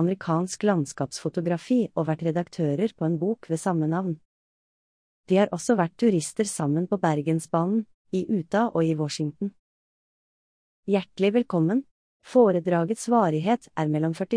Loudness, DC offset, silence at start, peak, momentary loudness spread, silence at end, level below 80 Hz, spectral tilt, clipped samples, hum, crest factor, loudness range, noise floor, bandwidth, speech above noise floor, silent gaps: -25 LUFS; under 0.1%; 0 s; -8 dBFS; 7 LU; 0 s; -68 dBFS; -6.5 dB/octave; under 0.1%; none; 18 dB; 4 LU; under -90 dBFS; 10.5 kHz; over 66 dB; 4.25-5.24 s, 7.94-8.05 s, 9.59-10.83 s, 11.91-12.20 s